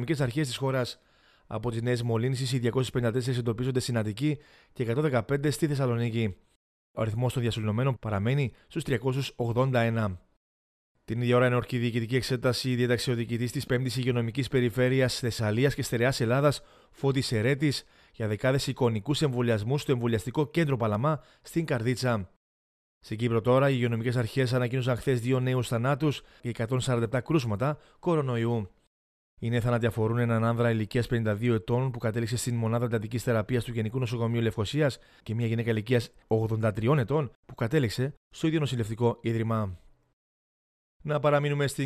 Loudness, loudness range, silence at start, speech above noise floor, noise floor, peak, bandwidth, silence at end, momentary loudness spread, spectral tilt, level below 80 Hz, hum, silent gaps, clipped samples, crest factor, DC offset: -28 LUFS; 3 LU; 0 s; over 63 dB; under -90 dBFS; -10 dBFS; 14.5 kHz; 0 s; 7 LU; -6.5 dB/octave; -56 dBFS; none; 6.56-6.94 s, 10.36-10.95 s, 22.36-23.01 s, 28.87-29.37 s, 37.35-37.43 s, 38.17-38.31 s, 40.13-41.00 s; under 0.1%; 18 dB; under 0.1%